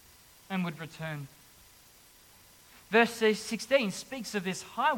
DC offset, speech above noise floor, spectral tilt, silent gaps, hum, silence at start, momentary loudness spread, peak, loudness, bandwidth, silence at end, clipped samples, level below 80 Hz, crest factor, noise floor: under 0.1%; 28 dB; -4 dB/octave; none; none; 0.5 s; 13 LU; -10 dBFS; -30 LUFS; 17.5 kHz; 0 s; under 0.1%; -70 dBFS; 22 dB; -58 dBFS